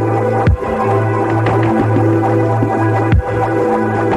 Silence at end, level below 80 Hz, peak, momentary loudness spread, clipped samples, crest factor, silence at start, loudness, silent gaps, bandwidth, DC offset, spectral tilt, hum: 0 s; -26 dBFS; -2 dBFS; 2 LU; under 0.1%; 12 dB; 0 s; -14 LUFS; none; 9 kHz; under 0.1%; -9 dB/octave; none